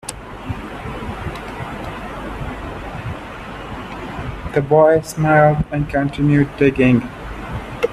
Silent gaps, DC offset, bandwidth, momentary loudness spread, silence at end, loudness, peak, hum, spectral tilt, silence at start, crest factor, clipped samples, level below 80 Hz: none; under 0.1%; 13.5 kHz; 17 LU; 0 s; -19 LUFS; 0 dBFS; none; -7 dB/octave; 0.05 s; 18 dB; under 0.1%; -36 dBFS